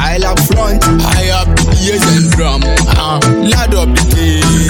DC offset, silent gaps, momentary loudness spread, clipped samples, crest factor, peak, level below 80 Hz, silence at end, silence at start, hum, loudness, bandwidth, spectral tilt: under 0.1%; none; 2 LU; under 0.1%; 10 dB; 0 dBFS; -14 dBFS; 0 s; 0 s; none; -10 LUFS; 17.5 kHz; -4.5 dB/octave